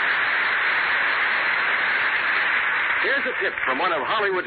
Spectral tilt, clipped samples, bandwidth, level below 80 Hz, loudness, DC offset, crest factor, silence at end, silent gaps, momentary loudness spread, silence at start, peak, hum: -7 dB/octave; under 0.1%; 4.8 kHz; -62 dBFS; -20 LUFS; under 0.1%; 12 dB; 0 s; none; 3 LU; 0 s; -10 dBFS; none